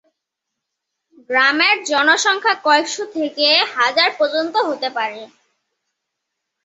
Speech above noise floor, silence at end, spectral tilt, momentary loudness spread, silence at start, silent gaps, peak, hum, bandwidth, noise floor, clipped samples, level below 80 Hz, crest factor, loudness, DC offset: 63 dB; 1.4 s; 0 dB/octave; 10 LU; 1.3 s; none; 0 dBFS; none; 8.4 kHz; -80 dBFS; under 0.1%; -72 dBFS; 18 dB; -16 LUFS; under 0.1%